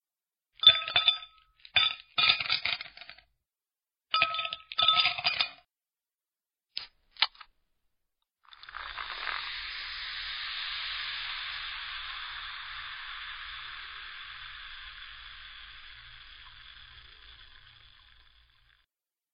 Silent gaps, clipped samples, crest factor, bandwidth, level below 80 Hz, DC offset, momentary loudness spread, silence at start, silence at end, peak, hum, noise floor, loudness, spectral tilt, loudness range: none; under 0.1%; 30 dB; 5.4 kHz; -62 dBFS; under 0.1%; 24 LU; 0.6 s; 1.45 s; -4 dBFS; none; under -90 dBFS; -28 LUFS; 4 dB/octave; 19 LU